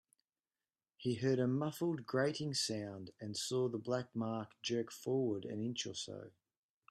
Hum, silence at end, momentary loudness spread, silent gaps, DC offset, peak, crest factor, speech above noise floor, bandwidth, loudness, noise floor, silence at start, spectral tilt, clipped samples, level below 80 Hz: none; 0.6 s; 9 LU; none; under 0.1%; -22 dBFS; 18 dB; over 52 dB; 13 kHz; -39 LUFS; under -90 dBFS; 1 s; -5 dB/octave; under 0.1%; -78 dBFS